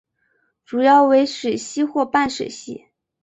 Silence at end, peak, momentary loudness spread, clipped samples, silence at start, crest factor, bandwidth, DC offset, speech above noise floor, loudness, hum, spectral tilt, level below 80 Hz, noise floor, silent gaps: 0.45 s; -2 dBFS; 19 LU; under 0.1%; 0.7 s; 16 dB; 8.2 kHz; under 0.1%; 49 dB; -18 LUFS; none; -3.5 dB/octave; -60 dBFS; -67 dBFS; none